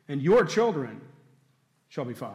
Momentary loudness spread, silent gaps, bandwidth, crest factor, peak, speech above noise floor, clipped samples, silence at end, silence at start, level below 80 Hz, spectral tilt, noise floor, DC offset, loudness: 18 LU; none; 13 kHz; 14 dB; -14 dBFS; 42 dB; under 0.1%; 0 s; 0.1 s; -62 dBFS; -6 dB/octave; -68 dBFS; under 0.1%; -25 LUFS